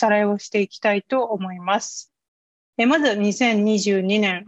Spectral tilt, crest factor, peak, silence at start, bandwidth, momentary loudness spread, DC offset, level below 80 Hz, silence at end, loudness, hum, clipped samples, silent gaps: -4.5 dB/octave; 16 dB; -6 dBFS; 0 s; 8.2 kHz; 8 LU; under 0.1%; -68 dBFS; 0.05 s; -20 LUFS; none; under 0.1%; 2.28-2.73 s